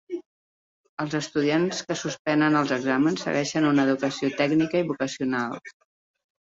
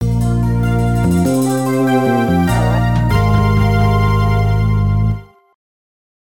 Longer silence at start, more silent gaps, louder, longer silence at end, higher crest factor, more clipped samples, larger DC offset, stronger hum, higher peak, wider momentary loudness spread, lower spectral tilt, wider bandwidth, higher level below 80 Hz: about the same, 0.1 s vs 0 s; first, 0.26-0.97 s, 2.19-2.25 s vs none; second, -24 LUFS vs -14 LUFS; second, 0.85 s vs 1 s; about the same, 16 dB vs 12 dB; neither; second, under 0.1% vs 1%; neither; second, -8 dBFS vs -2 dBFS; first, 11 LU vs 3 LU; second, -5 dB/octave vs -7.5 dB/octave; second, 7.8 kHz vs 17 kHz; second, -68 dBFS vs -24 dBFS